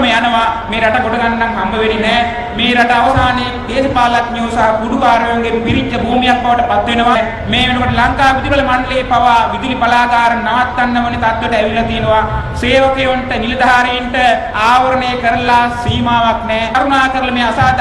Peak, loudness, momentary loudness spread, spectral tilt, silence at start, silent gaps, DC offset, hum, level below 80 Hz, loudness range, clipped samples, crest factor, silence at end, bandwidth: 0 dBFS; -12 LUFS; 4 LU; -5 dB/octave; 0 s; none; under 0.1%; none; -28 dBFS; 1 LU; under 0.1%; 12 dB; 0 s; 12 kHz